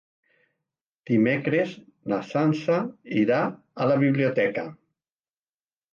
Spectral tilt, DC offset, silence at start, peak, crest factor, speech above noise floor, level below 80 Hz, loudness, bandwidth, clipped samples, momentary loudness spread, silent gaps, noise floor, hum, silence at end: -8 dB/octave; under 0.1%; 1.05 s; -10 dBFS; 16 dB; over 66 dB; -70 dBFS; -24 LUFS; 7.2 kHz; under 0.1%; 9 LU; none; under -90 dBFS; none; 1.2 s